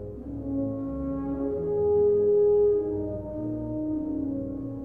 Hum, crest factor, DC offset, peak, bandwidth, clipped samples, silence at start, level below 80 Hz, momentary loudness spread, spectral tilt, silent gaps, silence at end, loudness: none; 12 dB; 0.2%; -16 dBFS; 2 kHz; under 0.1%; 0 s; -46 dBFS; 12 LU; -12.5 dB/octave; none; 0 s; -27 LUFS